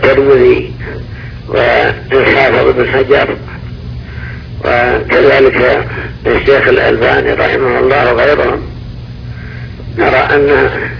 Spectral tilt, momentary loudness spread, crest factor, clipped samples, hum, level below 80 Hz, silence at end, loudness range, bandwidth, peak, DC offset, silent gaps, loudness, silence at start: -7.5 dB/octave; 18 LU; 10 dB; 0.8%; none; -28 dBFS; 0 s; 2 LU; 5.4 kHz; 0 dBFS; under 0.1%; none; -9 LUFS; 0 s